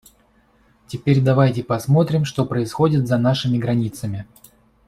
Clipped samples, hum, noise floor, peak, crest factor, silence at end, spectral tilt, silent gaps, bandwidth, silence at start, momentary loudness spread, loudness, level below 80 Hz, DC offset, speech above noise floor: under 0.1%; none; -57 dBFS; -2 dBFS; 16 dB; 0.65 s; -7.5 dB/octave; none; 13.5 kHz; 0.9 s; 11 LU; -19 LUFS; -52 dBFS; under 0.1%; 39 dB